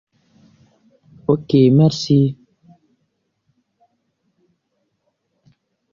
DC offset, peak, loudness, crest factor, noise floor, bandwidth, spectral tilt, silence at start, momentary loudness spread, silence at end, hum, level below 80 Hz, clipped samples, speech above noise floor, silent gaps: under 0.1%; -2 dBFS; -16 LUFS; 18 dB; -71 dBFS; 7.4 kHz; -8 dB/octave; 1.3 s; 13 LU; 3.6 s; none; -56 dBFS; under 0.1%; 57 dB; none